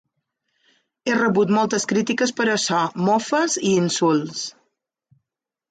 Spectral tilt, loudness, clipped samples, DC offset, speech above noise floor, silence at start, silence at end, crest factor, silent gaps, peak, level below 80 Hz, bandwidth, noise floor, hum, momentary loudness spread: -4 dB/octave; -20 LUFS; under 0.1%; under 0.1%; 64 dB; 1.05 s; 1.2 s; 14 dB; none; -8 dBFS; -66 dBFS; 9.4 kHz; -84 dBFS; none; 7 LU